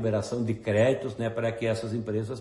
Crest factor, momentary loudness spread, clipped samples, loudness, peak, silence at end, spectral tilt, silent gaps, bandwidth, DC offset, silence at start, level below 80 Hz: 16 dB; 7 LU; under 0.1%; -28 LUFS; -12 dBFS; 0 s; -7 dB/octave; none; 11.5 kHz; under 0.1%; 0 s; -60 dBFS